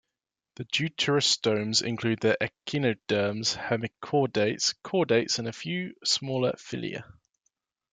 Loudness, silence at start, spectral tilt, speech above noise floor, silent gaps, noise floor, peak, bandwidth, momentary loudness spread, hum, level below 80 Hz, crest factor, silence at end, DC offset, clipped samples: -27 LUFS; 0.6 s; -3.5 dB/octave; 60 dB; none; -88 dBFS; -10 dBFS; 9.6 kHz; 9 LU; none; -68 dBFS; 18 dB; 0.9 s; under 0.1%; under 0.1%